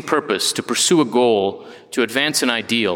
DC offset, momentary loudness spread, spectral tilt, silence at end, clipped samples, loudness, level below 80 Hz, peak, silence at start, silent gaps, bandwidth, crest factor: under 0.1%; 8 LU; -2.5 dB/octave; 0 s; under 0.1%; -18 LUFS; -66 dBFS; -2 dBFS; 0 s; none; 18 kHz; 18 dB